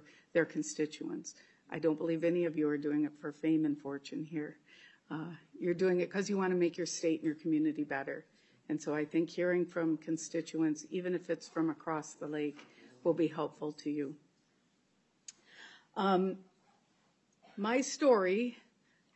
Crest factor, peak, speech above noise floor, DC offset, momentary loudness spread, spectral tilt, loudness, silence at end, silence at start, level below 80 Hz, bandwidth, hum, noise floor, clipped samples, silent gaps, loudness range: 20 dB; -16 dBFS; 40 dB; under 0.1%; 13 LU; -5.5 dB/octave; -35 LUFS; 0.6 s; 0.35 s; -86 dBFS; 8.2 kHz; none; -74 dBFS; under 0.1%; none; 5 LU